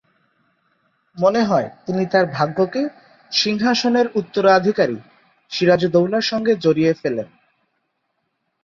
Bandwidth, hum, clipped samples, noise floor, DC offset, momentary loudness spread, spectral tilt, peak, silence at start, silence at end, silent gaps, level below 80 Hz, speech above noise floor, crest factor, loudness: 7.4 kHz; none; under 0.1%; -72 dBFS; under 0.1%; 10 LU; -5.5 dB/octave; -2 dBFS; 1.15 s; 1.4 s; none; -60 dBFS; 55 dB; 18 dB; -18 LUFS